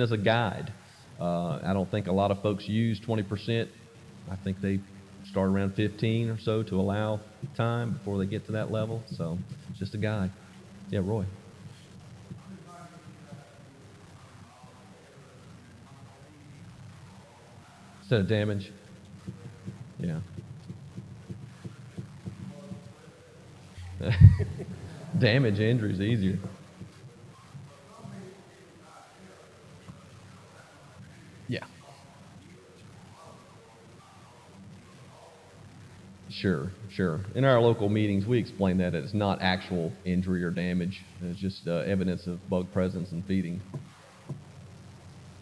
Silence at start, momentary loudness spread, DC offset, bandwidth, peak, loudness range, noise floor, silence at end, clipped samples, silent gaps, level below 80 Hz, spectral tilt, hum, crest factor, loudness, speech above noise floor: 0 s; 25 LU; under 0.1%; 11 kHz; -2 dBFS; 24 LU; -53 dBFS; 0 s; under 0.1%; none; -50 dBFS; -7.5 dB/octave; none; 30 dB; -29 LUFS; 25 dB